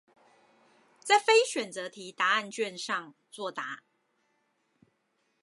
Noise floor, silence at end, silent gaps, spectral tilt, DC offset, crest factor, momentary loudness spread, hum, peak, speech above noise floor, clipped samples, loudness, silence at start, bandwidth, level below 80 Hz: -76 dBFS; 1.65 s; none; -1.5 dB/octave; under 0.1%; 24 dB; 18 LU; none; -8 dBFS; 46 dB; under 0.1%; -28 LUFS; 1.05 s; 11.5 kHz; under -90 dBFS